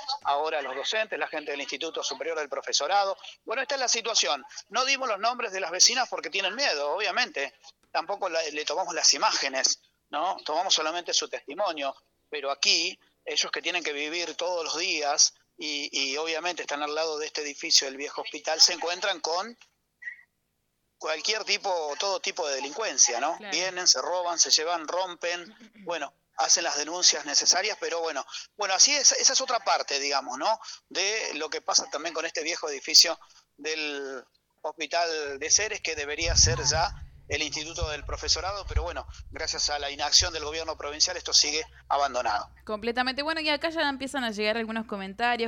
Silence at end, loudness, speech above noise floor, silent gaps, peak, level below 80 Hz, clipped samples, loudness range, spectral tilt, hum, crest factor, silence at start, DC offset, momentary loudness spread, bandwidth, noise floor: 0 s; -25 LUFS; 49 dB; none; -6 dBFS; -48 dBFS; under 0.1%; 5 LU; -0.5 dB/octave; none; 22 dB; 0 s; under 0.1%; 13 LU; 18 kHz; -76 dBFS